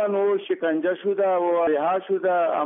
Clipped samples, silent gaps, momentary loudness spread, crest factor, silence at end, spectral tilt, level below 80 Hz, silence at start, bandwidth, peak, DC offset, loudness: under 0.1%; none; 3 LU; 10 dB; 0 s; -0.5 dB/octave; -72 dBFS; 0 s; 3.8 kHz; -12 dBFS; under 0.1%; -23 LUFS